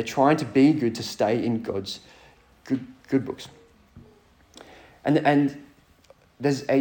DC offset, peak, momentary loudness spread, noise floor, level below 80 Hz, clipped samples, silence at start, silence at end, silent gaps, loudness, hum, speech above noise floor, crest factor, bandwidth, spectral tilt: under 0.1%; -6 dBFS; 16 LU; -56 dBFS; -62 dBFS; under 0.1%; 0 s; 0 s; none; -24 LUFS; none; 33 dB; 18 dB; 18 kHz; -6.5 dB/octave